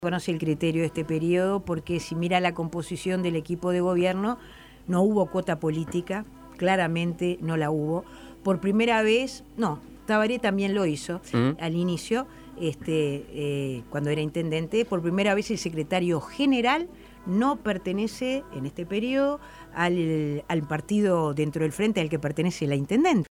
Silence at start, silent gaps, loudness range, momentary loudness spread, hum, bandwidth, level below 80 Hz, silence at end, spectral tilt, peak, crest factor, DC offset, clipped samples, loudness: 0 s; none; 2 LU; 8 LU; none; 16 kHz; -54 dBFS; 0.05 s; -6 dB/octave; -10 dBFS; 16 dB; under 0.1%; under 0.1%; -26 LUFS